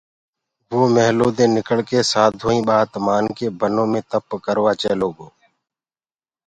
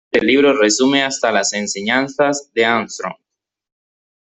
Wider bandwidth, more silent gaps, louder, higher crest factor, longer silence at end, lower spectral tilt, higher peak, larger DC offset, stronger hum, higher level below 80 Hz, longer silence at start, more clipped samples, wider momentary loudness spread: first, 10.5 kHz vs 8.4 kHz; neither; second, -18 LUFS vs -15 LUFS; about the same, 18 dB vs 16 dB; about the same, 1.2 s vs 1.1 s; first, -5 dB/octave vs -2.5 dB/octave; about the same, 0 dBFS vs -2 dBFS; neither; neither; first, -54 dBFS vs -60 dBFS; first, 0.7 s vs 0.15 s; neither; about the same, 8 LU vs 8 LU